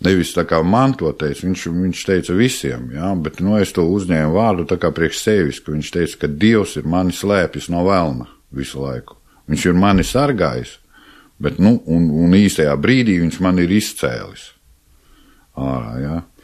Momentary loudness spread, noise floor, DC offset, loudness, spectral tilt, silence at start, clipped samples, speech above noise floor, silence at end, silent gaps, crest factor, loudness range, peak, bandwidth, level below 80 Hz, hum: 11 LU; -52 dBFS; under 0.1%; -17 LUFS; -6 dB/octave; 0 s; under 0.1%; 36 dB; 0.2 s; none; 16 dB; 4 LU; -2 dBFS; 14 kHz; -38 dBFS; none